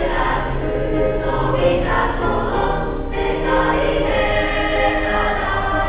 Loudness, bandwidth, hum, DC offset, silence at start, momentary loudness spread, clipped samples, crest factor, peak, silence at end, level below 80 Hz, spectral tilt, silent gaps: -19 LUFS; 4 kHz; none; 0.5%; 0 s; 4 LU; under 0.1%; 14 dB; -4 dBFS; 0 s; -26 dBFS; -9.5 dB/octave; none